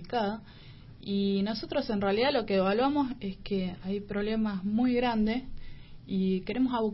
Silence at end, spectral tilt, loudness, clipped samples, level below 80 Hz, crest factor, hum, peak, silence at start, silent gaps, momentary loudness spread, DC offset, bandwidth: 0 s; -10 dB/octave; -30 LUFS; under 0.1%; -48 dBFS; 14 dB; none; -14 dBFS; 0 s; none; 9 LU; under 0.1%; 5.8 kHz